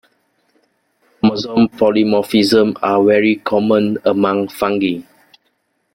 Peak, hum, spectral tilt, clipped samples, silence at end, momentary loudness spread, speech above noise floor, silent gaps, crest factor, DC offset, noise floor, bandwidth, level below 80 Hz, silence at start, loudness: 0 dBFS; none; -6 dB/octave; under 0.1%; 0.95 s; 5 LU; 51 dB; none; 14 dB; under 0.1%; -65 dBFS; 16.5 kHz; -56 dBFS; 1.25 s; -15 LUFS